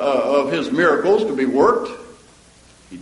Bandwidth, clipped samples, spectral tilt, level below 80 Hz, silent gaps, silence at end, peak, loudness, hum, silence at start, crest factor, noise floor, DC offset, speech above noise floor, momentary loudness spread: 11.5 kHz; under 0.1%; -5.5 dB/octave; -54 dBFS; none; 0 s; -2 dBFS; -17 LUFS; none; 0 s; 16 dB; -49 dBFS; under 0.1%; 32 dB; 8 LU